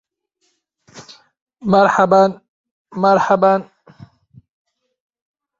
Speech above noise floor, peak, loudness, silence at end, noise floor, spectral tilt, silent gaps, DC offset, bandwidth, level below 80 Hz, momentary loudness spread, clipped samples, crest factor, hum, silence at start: 55 dB; 0 dBFS; -14 LUFS; 1.95 s; -68 dBFS; -6.5 dB/octave; 1.42-1.47 s, 2.48-2.64 s, 2.71-2.85 s; under 0.1%; 7.6 kHz; -60 dBFS; 9 LU; under 0.1%; 18 dB; none; 0.95 s